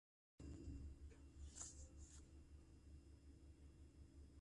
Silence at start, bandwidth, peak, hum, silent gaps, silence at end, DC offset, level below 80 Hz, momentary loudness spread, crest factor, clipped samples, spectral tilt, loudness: 0.4 s; 11 kHz; -38 dBFS; none; none; 0 s; under 0.1%; -62 dBFS; 11 LU; 22 dB; under 0.1%; -4.5 dB/octave; -61 LUFS